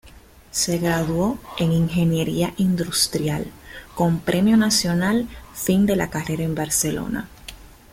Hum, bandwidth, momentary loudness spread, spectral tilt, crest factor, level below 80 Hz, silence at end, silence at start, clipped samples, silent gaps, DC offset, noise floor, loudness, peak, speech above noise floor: none; 16.5 kHz; 12 LU; -4.5 dB/octave; 16 dB; -44 dBFS; 0.25 s; 0.05 s; under 0.1%; none; under 0.1%; -47 dBFS; -21 LUFS; -6 dBFS; 26 dB